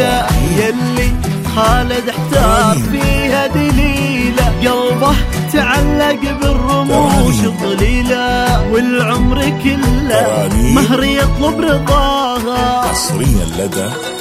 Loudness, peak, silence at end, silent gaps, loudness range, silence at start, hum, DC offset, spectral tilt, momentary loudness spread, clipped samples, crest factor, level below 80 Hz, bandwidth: -13 LUFS; 0 dBFS; 0 s; none; 1 LU; 0 s; none; under 0.1%; -5 dB/octave; 4 LU; under 0.1%; 12 dB; -20 dBFS; 16 kHz